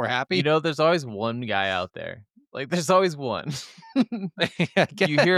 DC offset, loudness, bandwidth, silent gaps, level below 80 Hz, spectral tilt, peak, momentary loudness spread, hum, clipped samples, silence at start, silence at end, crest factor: under 0.1%; -24 LUFS; 14.5 kHz; none; -68 dBFS; -5 dB/octave; -8 dBFS; 14 LU; none; under 0.1%; 0 s; 0 s; 16 dB